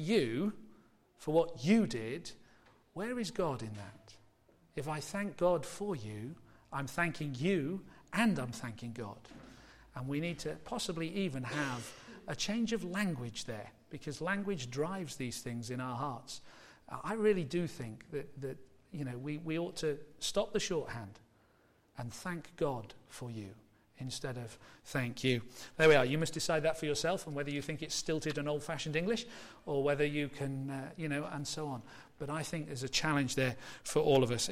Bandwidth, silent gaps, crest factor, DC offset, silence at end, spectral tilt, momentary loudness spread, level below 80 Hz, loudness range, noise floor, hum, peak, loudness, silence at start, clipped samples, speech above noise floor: 16 kHz; none; 20 dB; under 0.1%; 0 s; -5 dB/octave; 15 LU; -62 dBFS; 8 LU; -69 dBFS; none; -16 dBFS; -36 LUFS; 0 s; under 0.1%; 33 dB